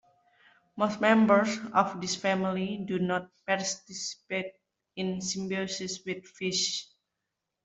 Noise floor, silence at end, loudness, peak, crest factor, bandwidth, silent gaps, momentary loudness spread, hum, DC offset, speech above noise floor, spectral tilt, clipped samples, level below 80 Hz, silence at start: -85 dBFS; 0.8 s; -29 LUFS; -8 dBFS; 22 dB; 8.2 kHz; none; 13 LU; none; under 0.1%; 56 dB; -4 dB/octave; under 0.1%; -72 dBFS; 0.75 s